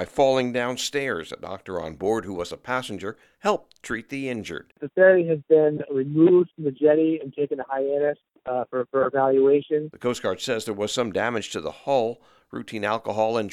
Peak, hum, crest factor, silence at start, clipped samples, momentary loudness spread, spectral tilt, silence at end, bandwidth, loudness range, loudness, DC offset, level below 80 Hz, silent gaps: -4 dBFS; none; 20 dB; 0 s; under 0.1%; 14 LU; -5 dB/octave; 0 s; 14.5 kHz; 8 LU; -24 LUFS; under 0.1%; -60 dBFS; none